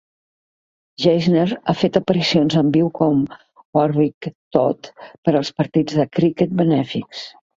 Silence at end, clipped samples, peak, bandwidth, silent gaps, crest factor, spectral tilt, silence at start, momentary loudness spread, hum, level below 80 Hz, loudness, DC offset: 0.3 s; under 0.1%; 0 dBFS; 7.6 kHz; 3.65-3.73 s, 4.14-4.21 s, 4.35-4.51 s, 5.18-5.23 s; 18 dB; -7 dB/octave; 1 s; 11 LU; none; -56 dBFS; -18 LUFS; under 0.1%